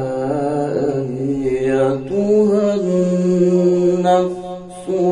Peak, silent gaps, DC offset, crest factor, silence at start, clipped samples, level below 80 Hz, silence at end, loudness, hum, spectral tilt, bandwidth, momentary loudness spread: -4 dBFS; none; under 0.1%; 12 dB; 0 s; under 0.1%; -50 dBFS; 0 s; -17 LUFS; none; -8 dB/octave; 10.5 kHz; 8 LU